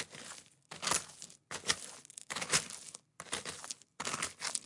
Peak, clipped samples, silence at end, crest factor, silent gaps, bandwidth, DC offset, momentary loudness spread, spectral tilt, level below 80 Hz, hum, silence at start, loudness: -12 dBFS; under 0.1%; 0 s; 28 dB; none; 11.5 kHz; under 0.1%; 17 LU; -0.5 dB/octave; -74 dBFS; none; 0 s; -37 LUFS